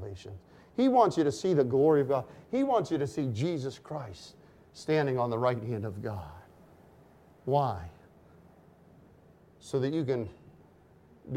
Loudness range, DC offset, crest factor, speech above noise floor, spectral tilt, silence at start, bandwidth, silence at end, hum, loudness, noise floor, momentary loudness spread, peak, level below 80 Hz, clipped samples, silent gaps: 10 LU; under 0.1%; 20 dB; 30 dB; -7 dB/octave; 0 s; 14.5 kHz; 0 s; none; -29 LUFS; -59 dBFS; 19 LU; -10 dBFS; -62 dBFS; under 0.1%; none